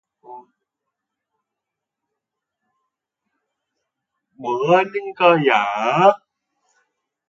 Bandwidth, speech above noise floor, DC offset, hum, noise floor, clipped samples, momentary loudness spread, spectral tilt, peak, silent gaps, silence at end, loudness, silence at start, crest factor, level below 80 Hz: 7.4 kHz; 67 dB; under 0.1%; none; -83 dBFS; under 0.1%; 11 LU; -6 dB/octave; 0 dBFS; none; 1.1 s; -17 LUFS; 0.3 s; 22 dB; -74 dBFS